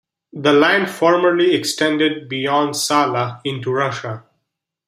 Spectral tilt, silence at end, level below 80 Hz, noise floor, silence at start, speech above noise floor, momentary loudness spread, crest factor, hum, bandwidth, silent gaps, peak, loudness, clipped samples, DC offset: -4 dB/octave; 0.7 s; -66 dBFS; -77 dBFS; 0.35 s; 60 dB; 11 LU; 16 dB; none; 15.5 kHz; none; -2 dBFS; -17 LUFS; under 0.1%; under 0.1%